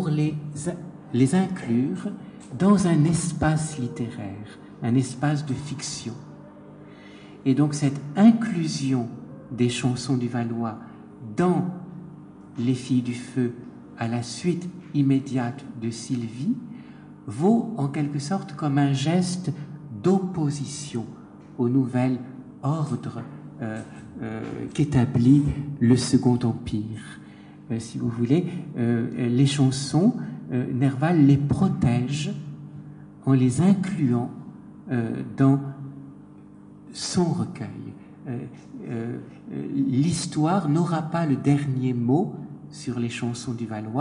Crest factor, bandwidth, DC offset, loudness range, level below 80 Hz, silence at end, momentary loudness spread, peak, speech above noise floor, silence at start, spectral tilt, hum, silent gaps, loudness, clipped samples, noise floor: 20 dB; 10.5 kHz; under 0.1%; 6 LU; -52 dBFS; 0 s; 19 LU; -6 dBFS; 23 dB; 0 s; -6.5 dB/octave; 50 Hz at -50 dBFS; none; -24 LUFS; under 0.1%; -46 dBFS